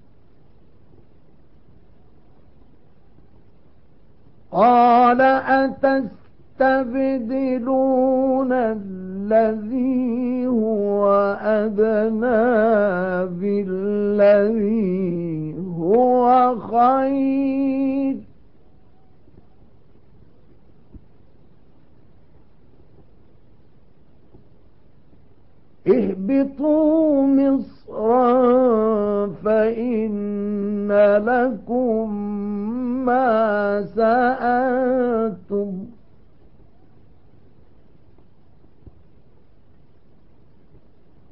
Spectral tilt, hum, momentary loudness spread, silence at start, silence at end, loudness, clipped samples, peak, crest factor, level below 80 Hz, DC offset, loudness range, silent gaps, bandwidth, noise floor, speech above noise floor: -11.5 dB/octave; none; 10 LU; 4.5 s; 5.4 s; -19 LUFS; under 0.1%; -6 dBFS; 16 dB; -54 dBFS; 0.6%; 8 LU; none; 5.6 kHz; -55 dBFS; 37 dB